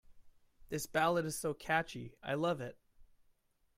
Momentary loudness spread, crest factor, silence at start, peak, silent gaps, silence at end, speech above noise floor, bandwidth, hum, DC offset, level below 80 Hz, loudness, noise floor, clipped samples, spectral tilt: 13 LU; 20 dB; 0.1 s; -18 dBFS; none; 0.7 s; 37 dB; 16 kHz; none; under 0.1%; -66 dBFS; -36 LUFS; -73 dBFS; under 0.1%; -4.5 dB/octave